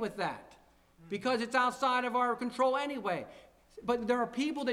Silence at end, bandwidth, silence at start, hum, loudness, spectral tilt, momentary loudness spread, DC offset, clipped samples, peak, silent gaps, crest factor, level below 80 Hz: 0 s; 14.5 kHz; 0 s; none; -32 LUFS; -4.5 dB/octave; 11 LU; under 0.1%; under 0.1%; -16 dBFS; none; 16 dB; -68 dBFS